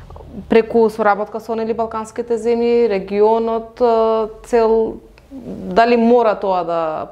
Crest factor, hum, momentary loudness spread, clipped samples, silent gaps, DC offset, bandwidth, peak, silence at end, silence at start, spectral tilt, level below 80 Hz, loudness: 16 dB; none; 11 LU; under 0.1%; none; under 0.1%; 11 kHz; 0 dBFS; 0 s; 0 s; -6.5 dB/octave; -46 dBFS; -16 LUFS